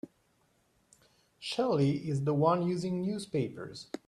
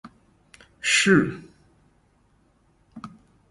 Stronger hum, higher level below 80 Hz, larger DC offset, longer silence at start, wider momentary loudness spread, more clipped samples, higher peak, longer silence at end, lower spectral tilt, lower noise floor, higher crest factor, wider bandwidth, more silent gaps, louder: neither; second, -70 dBFS vs -58 dBFS; neither; about the same, 0.05 s vs 0.05 s; second, 15 LU vs 26 LU; neither; second, -12 dBFS vs -6 dBFS; second, 0.1 s vs 0.45 s; first, -7 dB/octave vs -3.5 dB/octave; first, -71 dBFS vs -63 dBFS; about the same, 20 dB vs 22 dB; about the same, 12 kHz vs 11.5 kHz; neither; second, -31 LUFS vs -20 LUFS